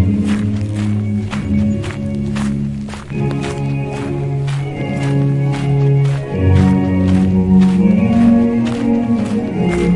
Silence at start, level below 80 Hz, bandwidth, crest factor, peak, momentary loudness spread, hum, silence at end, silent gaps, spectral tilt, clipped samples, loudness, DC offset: 0 s; -36 dBFS; 11 kHz; 14 dB; -2 dBFS; 9 LU; none; 0 s; none; -8.5 dB/octave; under 0.1%; -15 LUFS; under 0.1%